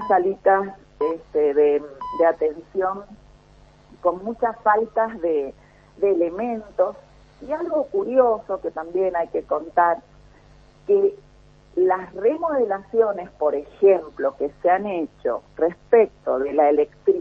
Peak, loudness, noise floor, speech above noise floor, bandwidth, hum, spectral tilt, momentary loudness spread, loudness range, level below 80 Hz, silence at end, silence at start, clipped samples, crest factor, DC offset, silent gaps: -4 dBFS; -22 LUFS; -51 dBFS; 30 dB; 5.8 kHz; none; -8 dB/octave; 9 LU; 3 LU; -56 dBFS; 0 s; 0 s; under 0.1%; 18 dB; under 0.1%; none